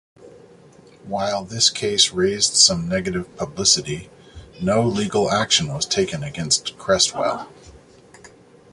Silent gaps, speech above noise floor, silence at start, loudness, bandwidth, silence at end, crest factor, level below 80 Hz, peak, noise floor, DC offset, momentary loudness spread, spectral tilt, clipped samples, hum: none; 28 dB; 0.2 s; -19 LUFS; 11.5 kHz; 0.45 s; 22 dB; -50 dBFS; 0 dBFS; -48 dBFS; under 0.1%; 13 LU; -2.5 dB/octave; under 0.1%; none